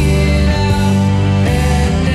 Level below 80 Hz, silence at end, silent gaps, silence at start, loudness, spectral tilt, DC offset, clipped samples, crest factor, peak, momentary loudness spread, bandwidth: -18 dBFS; 0 s; none; 0 s; -13 LUFS; -6.5 dB/octave; under 0.1%; under 0.1%; 10 dB; -2 dBFS; 1 LU; 13.5 kHz